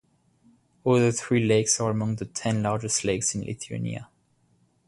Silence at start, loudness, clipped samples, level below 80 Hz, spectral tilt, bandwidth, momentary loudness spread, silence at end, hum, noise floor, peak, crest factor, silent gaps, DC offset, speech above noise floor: 0.85 s; -25 LUFS; under 0.1%; -56 dBFS; -4.5 dB/octave; 11.5 kHz; 11 LU; 0.85 s; none; -66 dBFS; -8 dBFS; 18 dB; none; under 0.1%; 41 dB